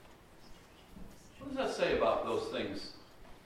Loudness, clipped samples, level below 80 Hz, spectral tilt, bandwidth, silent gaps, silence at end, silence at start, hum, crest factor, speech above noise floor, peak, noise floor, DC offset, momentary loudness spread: -35 LUFS; under 0.1%; -58 dBFS; -4.5 dB/octave; 16 kHz; none; 0.05 s; 0 s; none; 18 dB; 23 dB; -18 dBFS; -57 dBFS; under 0.1%; 24 LU